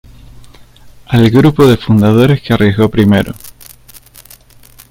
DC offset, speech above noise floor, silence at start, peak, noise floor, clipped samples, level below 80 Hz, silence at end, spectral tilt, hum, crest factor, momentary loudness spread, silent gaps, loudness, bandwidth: under 0.1%; 32 dB; 0.85 s; 0 dBFS; -40 dBFS; 0.2%; -36 dBFS; 1.4 s; -7.5 dB/octave; none; 12 dB; 7 LU; none; -10 LUFS; 17 kHz